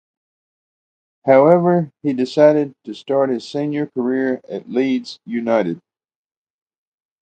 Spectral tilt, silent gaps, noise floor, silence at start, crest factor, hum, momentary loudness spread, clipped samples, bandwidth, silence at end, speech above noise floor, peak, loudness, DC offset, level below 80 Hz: -7.5 dB/octave; none; under -90 dBFS; 1.25 s; 18 dB; none; 13 LU; under 0.1%; 8.8 kHz; 1.45 s; over 73 dB; 0 dBFS; -18 LUFS; under 0.1%; -70 dBFS